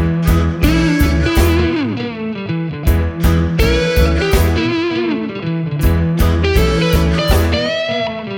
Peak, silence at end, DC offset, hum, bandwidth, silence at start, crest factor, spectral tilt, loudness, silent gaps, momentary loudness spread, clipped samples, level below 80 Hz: 0 dBFS; 0 s; under 0.1%; none; 19 kHz; 0 s; 14 dB; -6 dB/octave; -15 LUFS; none; 7 LU; under 0.1%; -18 dBFS